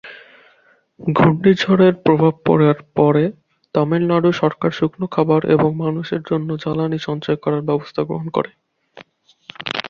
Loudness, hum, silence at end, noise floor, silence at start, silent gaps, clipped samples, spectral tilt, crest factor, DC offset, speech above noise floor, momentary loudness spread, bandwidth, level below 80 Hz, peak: -17 LUFS; none; 0 s; -56 dBFS; 0.05 s; none; under 0.1%; -8 dB/octave; 16 dB; under 0.1%; 39 dB; 10 LU; 7.2 kHz; -54 dBFS; -2 dBFS